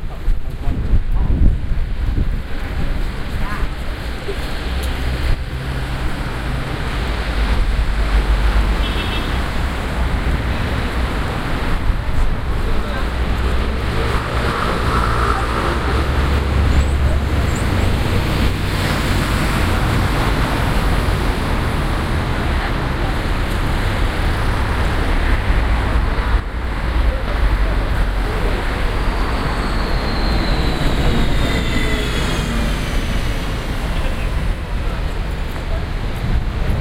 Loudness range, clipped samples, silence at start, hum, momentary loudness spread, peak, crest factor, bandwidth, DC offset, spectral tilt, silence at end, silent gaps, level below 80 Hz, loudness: 5 LU; under 0.1%; 0 s; none; 6 LU; -2 dBFS; 14 dB; 16 kHz; under 0.1%; -6 dB/octave; 0 s; none; -18 dBFS; -20 LUFS